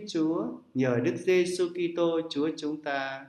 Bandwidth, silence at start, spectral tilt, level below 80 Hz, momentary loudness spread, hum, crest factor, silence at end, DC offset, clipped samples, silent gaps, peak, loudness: 12 kHz; 0 s; -5.5 dB/octave; -74 dBFS; 7 LU; none; 16 dB; 0 s; under 0.1%; under 0.1%; none; -12 dBFS; -29 LUFS